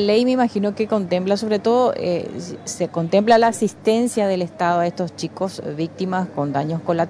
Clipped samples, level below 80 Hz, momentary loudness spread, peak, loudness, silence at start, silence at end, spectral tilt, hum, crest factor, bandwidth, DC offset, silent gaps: under 0.1%; -60 dBFS; 11 LU; -2 dBFS; -20 LUFS; 0 s; 0 s; -5.5 dB/octave; none; 16 dB; 11 kHz; under 0.1%; none